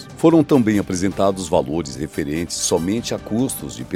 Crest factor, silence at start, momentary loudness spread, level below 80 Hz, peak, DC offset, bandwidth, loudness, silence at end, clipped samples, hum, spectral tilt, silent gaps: 18 dB; 0 s; 10 LU; -44 dBFS; -2 dBFS; under 0.1%; 16 kHz; -19 LUFS; 0 s; under 0.1%; none; -5 dB/octave; none